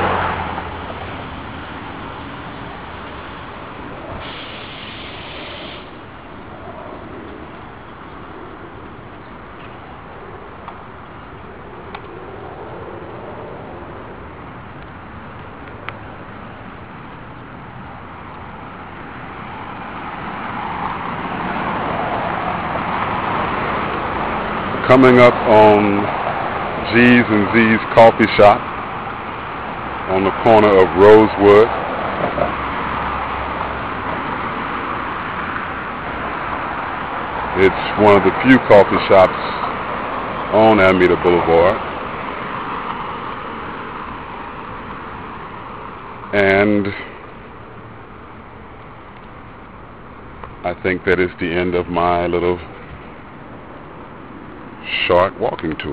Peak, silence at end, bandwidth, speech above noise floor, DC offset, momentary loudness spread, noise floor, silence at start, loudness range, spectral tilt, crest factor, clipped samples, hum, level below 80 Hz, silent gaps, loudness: 0 dBFS; 0 s; 8.4 kHz; 25 dB; 0.5%; 25 LU; -37 dBFS; 0 s; 21 LU; -7.5 dB/octave; 18 dB; under 0.1%; none; -42 dBFS; none; -16 LUFS